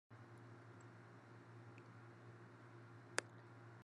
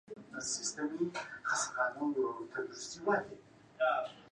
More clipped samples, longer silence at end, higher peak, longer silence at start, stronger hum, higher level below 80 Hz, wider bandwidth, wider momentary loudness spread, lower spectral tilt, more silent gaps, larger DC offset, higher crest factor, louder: neither; about the same, 0 s vs 0.05 s; about the same, -18 dBFS vs -18 dBFS; about the same, 0.1 s vs 0.1 s; neither; second, under -90 dBFS vs -78 dBFS; about the same, 10 kHz vs 11 kHz; first, 14 LU vs 9 LU; about the same, -3.5 dB/octave vs -2.5 dB/octave; neither; neither; first, 40 dB vs 18 dB; second, -55 LUFS vs -36 LUFS